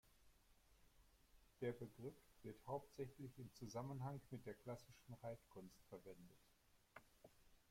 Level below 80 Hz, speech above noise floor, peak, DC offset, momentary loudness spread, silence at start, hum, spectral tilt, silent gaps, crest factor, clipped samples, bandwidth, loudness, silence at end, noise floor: -76 dBFS; 20 dB; -36 dBFS; under 0.1%; 14 LU; 0.05 s; none; -7 dB/octave; none; 20 dB; under 0.1%; 16.5 kHz; -55 LUFS; 0.1 s; -74 dBFS